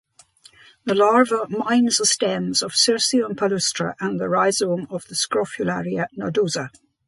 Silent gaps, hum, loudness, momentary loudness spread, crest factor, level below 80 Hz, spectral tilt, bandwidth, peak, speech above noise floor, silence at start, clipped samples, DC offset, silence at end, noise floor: none; none; -20 LUFS; 9 LU; 18 dB; -64 dBFS; -3 dB/octave; 11.5 kHz; -2 dBFS; 32 dB; 0.85 s; under 0.1%; under 0.1%; 0.4 s; -52 dBFS